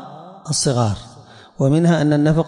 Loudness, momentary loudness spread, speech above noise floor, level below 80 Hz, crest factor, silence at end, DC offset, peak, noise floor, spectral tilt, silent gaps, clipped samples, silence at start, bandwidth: -17 LUFS; 17 LU; 27 dB; -44 dBFS; 12 dB; 0 s; under 0.1%; -6 dBFS; -43 dBFS; -5.5 dB/octave; none; under 0.1%; 0 s; 11 kHz